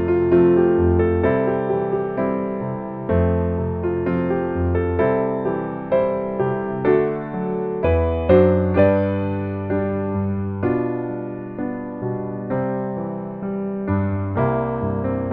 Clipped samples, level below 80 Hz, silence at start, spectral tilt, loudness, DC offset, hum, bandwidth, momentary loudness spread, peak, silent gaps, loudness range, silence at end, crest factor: under 0.1%; -38 dBFS; 0 s; -12 dB/octave; -21 LUFS; under 0.1%; none; 4.2 kHz; 11 LU; -2 dBFS; none; 6 LU; 0 s; 18 dB